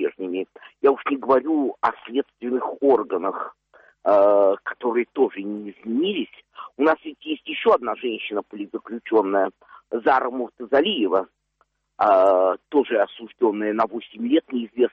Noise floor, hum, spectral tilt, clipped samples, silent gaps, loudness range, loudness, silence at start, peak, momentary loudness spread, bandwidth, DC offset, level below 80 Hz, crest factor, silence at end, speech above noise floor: -68 dBFS; none; -7 dB/octave; under 0.1%; none; 3 LU; -22 LUFS; 0 s; -6 dBFS; 13 LU; 5.6 kHz; under 0.1%; -68 dBFS; 16 dB; 0.05 s; 47 dB